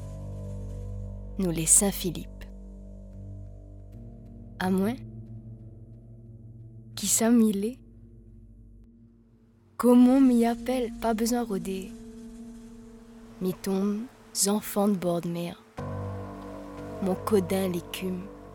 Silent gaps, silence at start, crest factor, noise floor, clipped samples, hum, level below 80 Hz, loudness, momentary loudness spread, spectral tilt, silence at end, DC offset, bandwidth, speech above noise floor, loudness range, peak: none; 0 s; 22 dB; -59 dBFS; under 0.1%; none; -48 dBFS; -26 LUFS; 26 LU; -4.5 dB/octave; 0 s; under 0.1%; 18 kHz; 34 dB; 10 LU; -6 dBFS